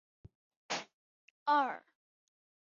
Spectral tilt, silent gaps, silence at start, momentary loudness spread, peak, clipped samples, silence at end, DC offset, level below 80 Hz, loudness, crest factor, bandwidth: -0.5 dB/octave; 0.93-1.46 s; 0.7 s; 16 LU; -20 dBFS; under 0.1%; 1 s; under 0.1%; -76 dBFS; -35 LUFS; 20 dB; 7.2 kHz